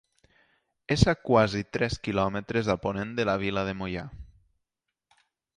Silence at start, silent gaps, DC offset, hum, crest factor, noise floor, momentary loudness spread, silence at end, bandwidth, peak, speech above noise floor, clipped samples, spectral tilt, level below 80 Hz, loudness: 0.9 s; none; under 0.1%; none; 24 dB; -85 dBFS; 11 LU; 1.35 s; 10.5 kHz; -4 dBFS; 58 dB; under 0.1%; -6 dB/octave; -46 dBFS; -27 LUFS